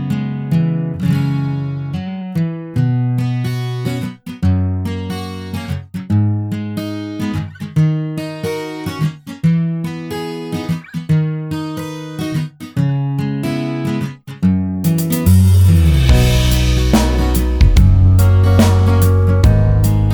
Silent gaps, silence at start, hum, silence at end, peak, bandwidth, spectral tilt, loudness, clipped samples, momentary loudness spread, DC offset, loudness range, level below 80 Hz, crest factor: none; 0 s; none; 0 s; 0 dBFS; over 20 kHz; -7 dB/octave; -16 LUFS; under 0.1%; 13 LU; under 0.1%; 8 LU; -22 dBFS; 14 dB